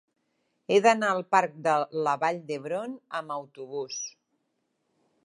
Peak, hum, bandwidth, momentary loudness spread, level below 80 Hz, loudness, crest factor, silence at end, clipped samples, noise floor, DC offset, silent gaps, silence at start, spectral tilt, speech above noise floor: -6 dBFS; none; 11.5 kHz; 15 LU; -86 dBFS; -27 LUFS; 22 dB; 1.15 s; under 0.1%; -77 dBFS; under 0.1%; none; 0.7 s; -3.5 dB/octave; 50 dB